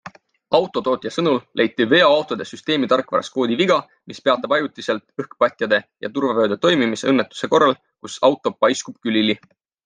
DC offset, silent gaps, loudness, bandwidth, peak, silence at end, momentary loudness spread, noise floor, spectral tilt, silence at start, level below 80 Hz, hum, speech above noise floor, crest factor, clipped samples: under 0.1%; none; -19 LUFS; 9.8 kHz; -2 dBFS; 0.5 s; 9 LU; -42 dBFS; -4.5 dB/octave; 0.05 s; -68 dBFS; none; 22 dB; 18 dB; under 0.1%